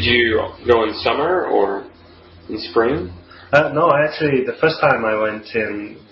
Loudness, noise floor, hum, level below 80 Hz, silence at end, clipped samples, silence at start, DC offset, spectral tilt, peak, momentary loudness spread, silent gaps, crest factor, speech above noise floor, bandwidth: -17 LUFS; -44 dBFS; none; -48 dBFS; 0.15 s; under 0.1%; 0 s; under 0.1%; -3 dB/octave; -2 dBFS; 10 LU; none; 16 dB; 27 dB; 7 kHz